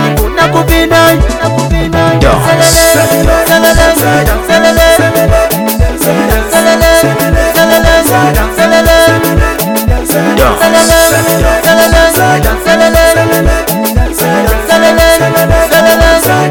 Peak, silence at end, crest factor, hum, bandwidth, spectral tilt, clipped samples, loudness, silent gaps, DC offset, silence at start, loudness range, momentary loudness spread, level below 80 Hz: 0 dBFS; 0 s; 6 dB; none; over 20 kHz; -4 dB/octave; 3%; -7 LUFS; none; under 0.1%; 0 s; 1 LU; 5 LU; -16 dBFS